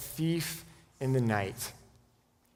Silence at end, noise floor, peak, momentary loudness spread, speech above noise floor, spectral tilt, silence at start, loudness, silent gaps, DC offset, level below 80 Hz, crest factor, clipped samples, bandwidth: 0.75 s; -68 dBFS; -14 dBFS; 11 LU; 37 dB; -5.5 dB/octave; 0 s; -33 LUFS; none; under 0.1%; -62 dBFS; 20 dB; under 0.1%; 19.5 kHz